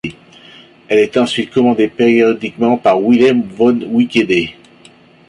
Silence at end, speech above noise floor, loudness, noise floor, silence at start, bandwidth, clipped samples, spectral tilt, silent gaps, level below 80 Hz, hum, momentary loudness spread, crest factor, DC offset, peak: 0.75 s; 32 dB; -13 LUFS; -44 dBFS; 0.05 s; 11 kHz; under 0.1%; -6 dB/octave; none; -52 dBFS; none; 5 LU; 12 dB; under 0.1%; -2 dBFS